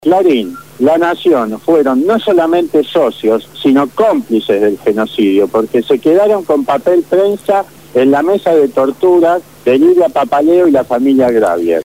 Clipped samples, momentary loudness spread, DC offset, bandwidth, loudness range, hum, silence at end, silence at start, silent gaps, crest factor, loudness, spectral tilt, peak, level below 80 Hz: under 0.1%; 5 LU; 0.4%; 16 kHz; 2 LU; none; 0 s; 0.05 s; none; 10 dB; -11 LUFS; -6 dB/octave; 0 dBFS; -54 dBFS